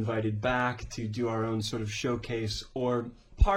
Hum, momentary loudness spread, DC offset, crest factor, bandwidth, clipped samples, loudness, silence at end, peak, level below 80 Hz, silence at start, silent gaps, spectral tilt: none; 5 LU; under 0.1%; 20 dB; 14 kHz; under 0.1%; -31 LUFS; 0 s; -10 dBFS; -36 dBFS; 0 s; none; -5.5 dB/octave